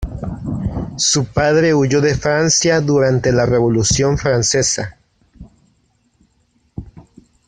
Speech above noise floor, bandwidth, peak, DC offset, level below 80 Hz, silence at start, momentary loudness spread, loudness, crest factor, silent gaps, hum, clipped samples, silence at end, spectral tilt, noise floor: 45 dB; 10.5 kHz; 0 dBFS; under 0.1%; -36 dBFS; 0 s; 13 LU; -15 LUFS; 16 dB; none; none; under 0.1%; 0.45 s; -4 dB/octave; -60 dBFS